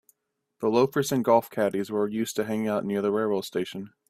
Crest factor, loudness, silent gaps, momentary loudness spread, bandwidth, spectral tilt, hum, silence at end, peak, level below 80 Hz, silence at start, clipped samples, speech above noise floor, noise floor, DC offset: 20 dB; -26 LUFS; none; 7 LU; 16 kHz; -5.5 dB/octave; none; 0.2 s; -6 dBFS; -68 dBFS; 0.6 s; under 0.1%; 50 dB; -76 dBFS; under 0.1%